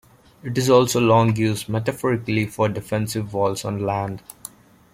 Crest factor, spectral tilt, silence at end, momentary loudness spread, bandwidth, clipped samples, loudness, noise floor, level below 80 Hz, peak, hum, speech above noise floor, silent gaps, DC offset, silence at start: 18 dB; -5.5 dB/octave; 0.75 s; 17 LU; 16.5 kHz; under 0.1%; -21 LUFS; -43 dBFS; -54 dBFS; -4 dBFS; none; 23 dB; none; under 0.1%; 0.45 s